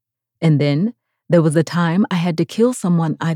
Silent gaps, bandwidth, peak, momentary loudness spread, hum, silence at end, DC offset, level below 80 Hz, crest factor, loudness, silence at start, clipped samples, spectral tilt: none; 12.5 kHz; -4 dBFS; 5 LU; none; 0 s; under 0.1%; -72 dBFS; 14 dB; -17 LUFS; 0.4 s; under 0.1%; -7 dB/octave